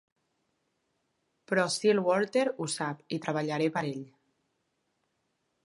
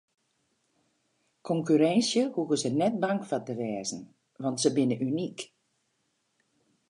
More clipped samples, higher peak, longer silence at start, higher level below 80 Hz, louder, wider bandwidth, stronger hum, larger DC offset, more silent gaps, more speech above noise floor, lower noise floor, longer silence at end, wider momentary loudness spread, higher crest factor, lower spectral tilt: neither; about the same, -12 dBFS vs -10 dBFS; about the same, 1.5 s vs 1.45 s; about the same, -80 dBFS vs -78 dBFS; about the same, -29 LUFS vs -28 LUFS; about the same, 11.5 kHz vs 11 kHz; neither; neither; neither; about the same, 49 dB vs 48 dB; about the same, -78 dBFS vs -76 dBFS; about the same, 1.55 s vs 1.45 s; second, 9 LU vs 13 LU; about the same, 20 dB vs 20 dB; about the same, -4.5 dB/octave vs -5 dB/octave